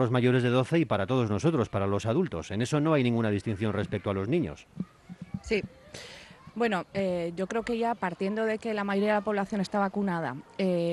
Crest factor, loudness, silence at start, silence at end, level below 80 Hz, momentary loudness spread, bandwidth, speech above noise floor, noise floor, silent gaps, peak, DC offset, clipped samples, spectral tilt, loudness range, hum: 16 dB; -29 LUFS; 0 s; 0 s; -58 dBFS; 16 LU; 12 kHz; 21 dB; -49 dBFS; none; -14 dBFS; under 0.1%; under 0.1%; -7 dB/octave; 6 LU; none